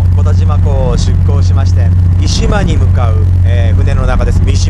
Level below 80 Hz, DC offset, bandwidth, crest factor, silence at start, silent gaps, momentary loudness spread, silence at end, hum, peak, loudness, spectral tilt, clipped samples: -14 dBFS; under 0.1%; 8.6 kHz; 8 dB; 0 s; none; 2 LU; 0 s; none; 0 dBFS; -10 LUFS; -6.5 dB/octave; under 0.1%